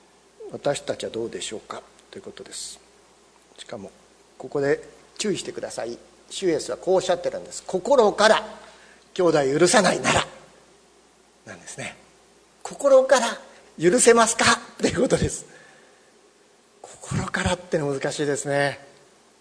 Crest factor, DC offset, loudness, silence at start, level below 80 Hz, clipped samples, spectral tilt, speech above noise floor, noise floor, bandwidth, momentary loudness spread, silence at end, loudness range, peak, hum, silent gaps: 24 dB; under 0.1%; -22 LUFS; 0.4 s; -52 dBFS; under 0.1%; -3.5 dB/octave; 35 dB; -57 dBFS; 11 kHz; 22 LU; 0.65 s; 12 LU; 0 dBFS; none; none